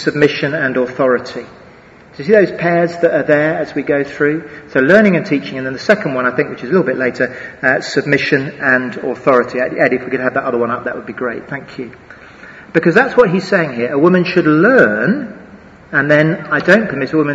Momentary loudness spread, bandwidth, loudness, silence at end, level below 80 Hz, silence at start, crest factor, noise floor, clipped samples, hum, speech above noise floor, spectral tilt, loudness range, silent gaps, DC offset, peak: 11 LU; 8 kHz; -14 LUFS; 0 s; -52 dBFS; 0 s; 14 dB; -41 dBFS; 0.1%; none; 27 dB; -7 dB/octave; 4 LU; none; under 0.1%; 0 dBFS